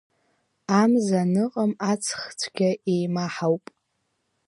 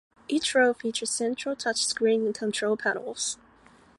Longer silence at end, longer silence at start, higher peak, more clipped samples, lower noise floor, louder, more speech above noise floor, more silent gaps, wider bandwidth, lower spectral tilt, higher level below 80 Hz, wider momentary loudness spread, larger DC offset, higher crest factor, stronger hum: first, 0.9 s vs 0.65 s; first, 0.7 s vs 0.3 s; first, -6 dBFS vs -10 dBFS; neither; first, -75 dBFS vs -57 dBFS; first, -24 LUFS vs -27 LUFS; first, 52 dB vs 30 dB; neither; about the same, 11.5 kHz vs 11.5 kHz; first, -5.5 dB/octave vs -2 dB/octave; about the same, -72 dBFS vs -68 dBFS; about the same, 9 LU vs 8 LU; neither; about the same, 18 dB vs 16 dB; neither